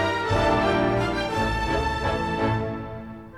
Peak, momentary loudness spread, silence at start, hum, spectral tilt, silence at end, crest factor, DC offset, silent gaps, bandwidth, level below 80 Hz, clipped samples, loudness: -10 dBFS; 10 LU; 0 s; none; -6 dB/octave; 0 s; 14 dB; 0.2%; none; 14 kHz; -36 dBFS; under 0.1%; -24 LUFS